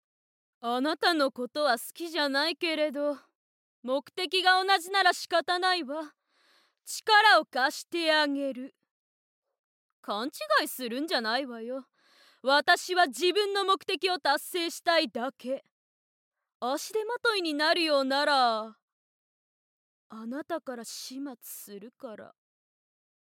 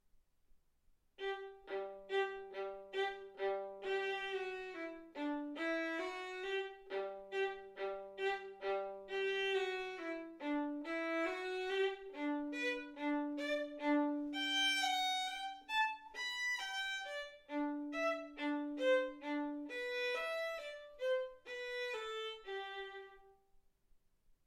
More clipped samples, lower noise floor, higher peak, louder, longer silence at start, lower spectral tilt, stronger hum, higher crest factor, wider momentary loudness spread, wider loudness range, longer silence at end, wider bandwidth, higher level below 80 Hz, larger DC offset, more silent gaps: neither; second, -67 dBFS vs -73 dBFS; first, -10 dBFS vs -24 dBFS; first, -27 LUFS vs -40 LUFS; about the same, 0.65 s vs 0.55 s; about the same, -1 dB/octave vs -1.5 dB/octave; neither; about the same, 20 dB vs 16 dB; first, 17 LU vs 10 LU; about the same, 7 LU vs 6 LU; second, 0.95 s vs 1.15 s; about the same, 17 kHz vs 16.5 kHz; second, under -90 dBFS vs -74 dBFS; neither; first, 3.35-3.83 s, 8.91-9.42 s, 9.59-10.03 s, 15.71-16.31 s, 16.55-16.60 s, 18.82-20.10 s vs none